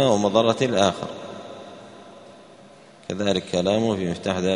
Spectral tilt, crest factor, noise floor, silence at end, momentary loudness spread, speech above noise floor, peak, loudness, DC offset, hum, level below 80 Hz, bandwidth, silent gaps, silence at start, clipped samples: -5 dB/octave; 20 dB; -48 dBFS; 0 s; 22 LU; 27 dB; -4 dBFS; -22 LUFS; under 0.1%; none; -58 dBFS; 10.5 kHz; none; 0 s; under 0.1%